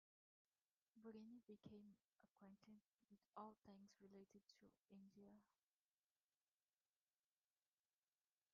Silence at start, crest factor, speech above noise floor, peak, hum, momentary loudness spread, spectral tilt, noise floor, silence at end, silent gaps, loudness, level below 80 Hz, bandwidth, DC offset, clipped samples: 0.95 s; 24 dB; over 22 dB; -46 dBFS; none; 7 LU; -6 dB/octave; under -90 dBFS; 3.1 s; 2.05-2.09 s, 2.31-2.35 s, 2.94-2.99 s, 4.79-4.83 s; -66 LUFS; under -90 dBFS; 6 kHz; under 0.1%; under 0.1%